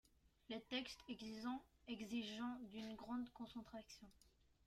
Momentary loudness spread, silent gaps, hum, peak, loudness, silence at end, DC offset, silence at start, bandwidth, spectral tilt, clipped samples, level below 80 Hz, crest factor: 10 LU; none; none; -34 dBFS; -51 LUFS; 0.35 s; under 0.1%; 0.5 s; 14.5 kHz; -4 dB/octave; under 0.1%; -76 dBFS; 18 dB